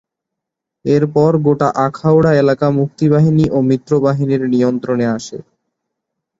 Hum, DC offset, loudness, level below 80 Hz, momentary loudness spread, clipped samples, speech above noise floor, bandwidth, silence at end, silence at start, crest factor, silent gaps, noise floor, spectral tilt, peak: none; under 0.1%; -14 LUFS; -48 dBFS; 6 LU; under 0.1%; 68 dB; 7.8 kHz; 1 s; 0.85 s; 14 dB; none; -81 dBFS; -8.5 dB/octave; -2 dBFS